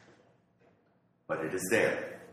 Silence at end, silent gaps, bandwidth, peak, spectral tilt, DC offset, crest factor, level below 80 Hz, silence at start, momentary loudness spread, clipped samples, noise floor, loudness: 0 s; none; 14.5 kHz; -14 dBFS; -4 dB/octave; under 0.1%; 22 dB; -74 dBFS; 1.3 s; 10 LU; under 0.1%; -70 dBFS; -31 LUFS